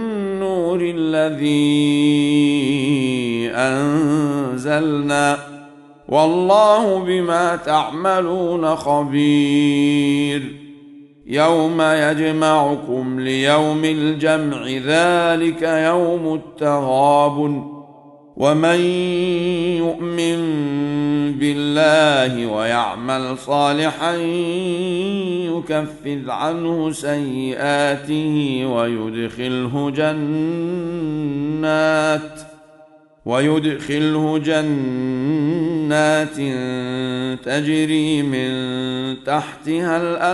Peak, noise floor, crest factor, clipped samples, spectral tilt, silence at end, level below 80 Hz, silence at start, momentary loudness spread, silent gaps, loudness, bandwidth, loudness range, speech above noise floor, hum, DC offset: 0 dBFS; -48 dBFS; 18 dB; under 0.1%; -5.5 dB/octave; 0 s; -56 dBFS; 0 s; 8 LU; none; -18 LUFS; 11.5 kHz; 4 LU; 31 dB; none; under 0.1%